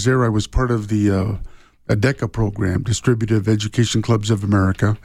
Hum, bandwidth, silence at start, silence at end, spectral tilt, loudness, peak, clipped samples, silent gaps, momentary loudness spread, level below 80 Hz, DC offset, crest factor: none; 12 kHz; 0 s; 0.05 s; -6 dB/octave; -19 LUFS; -4 dBFS; under 0.1%; none; 5 LU; -34 dBFS; under 0.1%; 14 dB